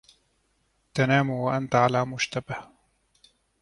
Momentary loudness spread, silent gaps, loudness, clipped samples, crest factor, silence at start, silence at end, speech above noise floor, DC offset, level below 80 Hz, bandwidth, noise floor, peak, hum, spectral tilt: 12 LU; none; -25 LUFS; under 0.1%; 22 dB; 0.95 s; 1 s; 46 dB; under 0.1%; -62 dBFS; 11.5 kHz; -70 dBFS; -6 dBFS; none; -5.5 dB/octave